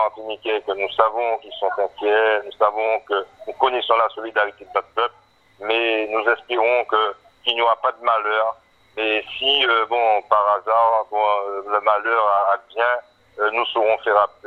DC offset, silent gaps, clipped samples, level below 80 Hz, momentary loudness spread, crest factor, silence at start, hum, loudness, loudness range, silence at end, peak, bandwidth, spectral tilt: under 0.1%; none; under 0.1%; -66 dBFS; 8 LU; 20 dB; 0 s; none; -20 LUFS; 3 LU; 0.2 s; 0 dBFS; 6.2 kHz; -4 dB/octave